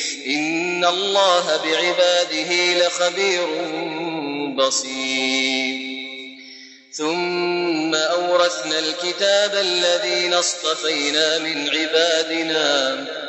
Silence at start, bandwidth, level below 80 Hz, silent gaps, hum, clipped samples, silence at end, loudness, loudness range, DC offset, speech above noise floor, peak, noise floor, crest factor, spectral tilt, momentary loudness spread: 0 s; 9.2 kHz; -84 dBFS; none; none; under 0.1%; 0 s; -19 LUFS; 4 LU; under 0.1%; 22 dB; -4 dBFS; -42 dBFS; 16 dB; -1.5 dB/octave; 9 LU